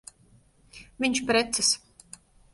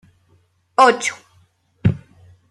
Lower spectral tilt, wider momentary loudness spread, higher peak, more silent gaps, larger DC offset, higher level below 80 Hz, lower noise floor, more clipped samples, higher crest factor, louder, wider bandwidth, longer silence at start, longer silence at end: second, -1.5 dB/octave vs -5 dB/octave; second, 7 LU vs 17 LU; second, -12 dBFS vs -2 dBFS; neither; neither; second, -58 dBFS vs -48 dBFS; about the same, -60 dBFS vs -59 dBFS; neither; about the same, 18 dB vs 20 dB; second, -25 LUFS vs -18 LUFS; second, 11.5 kHz vs 13 kHz; about the same, 0.75 s vs 0.8 s; first, 0.75 s vs 0.55 s